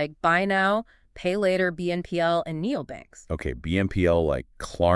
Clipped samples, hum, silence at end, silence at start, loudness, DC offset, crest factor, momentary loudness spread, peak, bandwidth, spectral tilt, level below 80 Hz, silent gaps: under 0.1%; none; 0 s; 0 s; -25 LUFS; under 0.1%; 18 dB; 10 LU; -6 dBFS; 12 kHz; -6.5 dB/octave; -44 dBFS; none